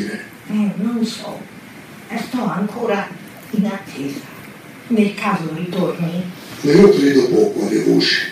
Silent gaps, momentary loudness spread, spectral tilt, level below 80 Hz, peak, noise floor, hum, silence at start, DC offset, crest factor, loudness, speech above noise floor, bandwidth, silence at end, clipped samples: none; 22 LU; -6 dB/octave; -54 dBFS; 0 dBFS; -37 dBFS; none; 0 s; under 0.1%; 18 dB; -17 LUFS; 21 dB; 15.5 kHz; 0 s; under 0.1%